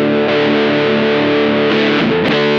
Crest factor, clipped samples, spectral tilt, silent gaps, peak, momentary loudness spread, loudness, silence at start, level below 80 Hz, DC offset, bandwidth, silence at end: 10 dB; under 0.1%; -6.5 dB/octave; none; -2 dBFS; 1 LU; -13 LUFS; 0 s; -52 dBFS; under 0.1%; 7.2 kHz; 0 s